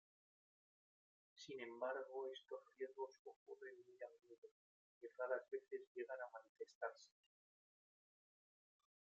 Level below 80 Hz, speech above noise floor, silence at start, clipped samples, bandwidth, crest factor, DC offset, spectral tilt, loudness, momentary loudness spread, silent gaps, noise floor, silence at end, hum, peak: under -90 dBFS; over 38 dB; 1.35 s; under 0.1%; 7.6 kHz; 24 dB; under 0.1%; -1 dB/octave; -52 LUFS; 16 LU; 3.19-3.25 s, 3.36-3.46 s, 4.38-4.42 s, 4.51-5.01 s, 5.87-5.95 s, 6.49-6.55 s, 6.75-6.81 s; under -90 dBFS; 1.95 s; none; -32 dBFS